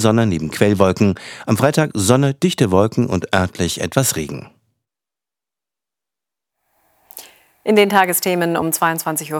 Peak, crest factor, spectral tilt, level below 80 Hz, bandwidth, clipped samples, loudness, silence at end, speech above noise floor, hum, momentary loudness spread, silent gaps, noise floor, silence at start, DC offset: 0 dBFS; 18 dB; -5 dB/octave; -54 dBFS; over 20 kHz; under 0.1%; -17 LUFS; 0 s; 73 dB; none; 11 LU; none; -89 dBFS; 0 s; under 0.1%